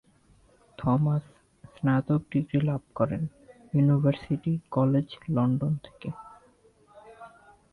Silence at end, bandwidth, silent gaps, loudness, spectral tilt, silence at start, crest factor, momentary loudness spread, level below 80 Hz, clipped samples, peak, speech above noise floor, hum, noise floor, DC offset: 0.45 s; 4.5 kHz; none; -27 LUFS; -10 dB/octave; 0.8 s; 16 dB; 14 LU; -58 dBFS; under 0.1%; -12 dBFS; 35 dB; none; -61 dBFS; under 0.1%